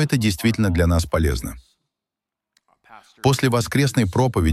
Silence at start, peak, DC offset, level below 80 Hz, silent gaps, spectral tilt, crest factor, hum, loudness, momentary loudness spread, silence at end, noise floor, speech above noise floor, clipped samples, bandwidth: 0 s; -4 dBFS; under 0.1%; -32 dBFS; none; -6 dB/octave; 18 dB; none; -20 LUFS; 5 LU; 0 s; -86 dBFS; 67 dB; under 0.1%; 15.5 kHz